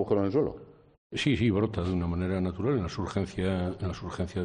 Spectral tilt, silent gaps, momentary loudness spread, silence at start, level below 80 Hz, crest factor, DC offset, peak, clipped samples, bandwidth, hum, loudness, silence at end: -7 dB/octave; 0.98-1.10 s; 9 LU; 0 s; -52 dBFS; 18 dB; under 0.1%; -12 dBFS; under 0.1%; 10 kHz; none; -30 LUFS; 0 s